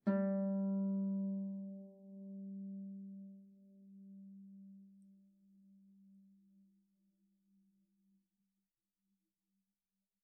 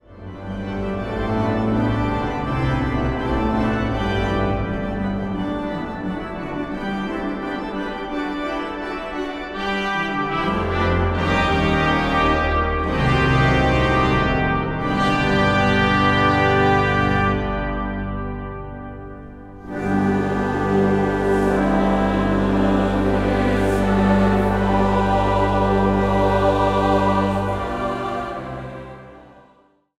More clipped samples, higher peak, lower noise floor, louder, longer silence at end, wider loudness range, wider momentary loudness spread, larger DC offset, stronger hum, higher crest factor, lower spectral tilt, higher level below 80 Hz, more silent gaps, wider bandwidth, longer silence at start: neither; second, -24 dBFS vs -4 dBFS; first, under -90 dBFS vs -56 dBFS; second, -41 LUFS vs -20 LUFS; first, 4 s vs 0.75 s; first, 22 LU vs 7 LU; first, 24 LU vs 11 LU; neither; neither; about the same, 20 dB vs 16 dB; first, -9 dB/octave vs -7 dB/octave; second, under -90 dBFS vs -32 dBFS; neither; second, 2 kHz vs 12 kHz; about the same, 0.05 s vs 0.1 s